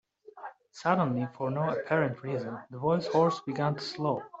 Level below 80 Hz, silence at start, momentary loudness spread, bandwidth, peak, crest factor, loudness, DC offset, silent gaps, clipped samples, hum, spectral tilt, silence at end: -70 dBFS; 0.35 s; 14 LU; 8 kHz; -10 dBFS; 20 dB; -30 LUFS; under 0.1%; none; under 0.1%; none; -7 dB/octave; 0 s